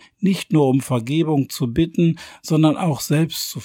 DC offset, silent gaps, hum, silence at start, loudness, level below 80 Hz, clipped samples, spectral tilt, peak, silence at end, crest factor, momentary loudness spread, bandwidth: under 0.1%; none; none; 0.2 s; -19 LUFS; -50 dBFS; under 0.1%; -6 dB/octave; -4 dBFS; 0 s; 16 dB; 5 LU; 17 kHz